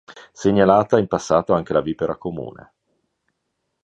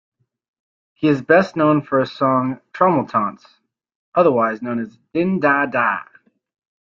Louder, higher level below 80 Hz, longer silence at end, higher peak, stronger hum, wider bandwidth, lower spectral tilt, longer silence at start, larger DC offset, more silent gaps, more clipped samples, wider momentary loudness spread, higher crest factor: about the same, -19 LUFS vs -18 LUFS; first, -50 dBFS vs -62 dBFS; first, 1.3 s vs 0.85 s; about the same, 0 dBFS vs -2 dBFS; neither; first, 8.6 kHz vs 7.2 kHz; second, -6.5 dB/octave vs -8 dB/octave; second, 0.1 s vs 1 s; neither; second, none vs 3.95-4.12 s; neither; first, 15 LU vs 11 LU; about the same, 20 dB vs 18 dB